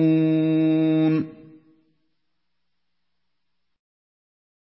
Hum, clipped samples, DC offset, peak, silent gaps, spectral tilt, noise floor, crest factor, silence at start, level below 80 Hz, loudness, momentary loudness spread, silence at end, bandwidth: 60 Hz at -75 dBFS; under 0.1%; under 0.1%; -10 dBFS; none; -12.5 dB/octave; -81 dBFS; 14 dB; 0 s; -70 dBFS; -20 LUFS; 6 LU; 3.45 s; 5.6 kHz